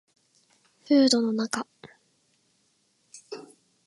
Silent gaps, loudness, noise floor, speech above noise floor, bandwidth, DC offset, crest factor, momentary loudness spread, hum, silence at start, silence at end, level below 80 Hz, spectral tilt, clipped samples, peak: none; -24 LUFS; -69 dBFS; 46 dB; 11.5 kHz; under 0.1%; 20 dB; 23 LU; none; 0.9 s; 0.45 s; -80 dBFS; -3.5 dB/octave; under 0.1%; -8 dBFS